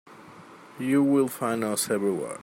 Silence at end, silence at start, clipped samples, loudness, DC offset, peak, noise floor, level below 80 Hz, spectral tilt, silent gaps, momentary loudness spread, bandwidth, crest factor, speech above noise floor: 0 s; 0.05 s; under 0.1%; -25 LUFS; under 0.1%; -12 dBFS; -48 dBFS; -74 dBFS; -5 dB/octave; none; 6 LU; 16 kHz; 16 dB; 23 dB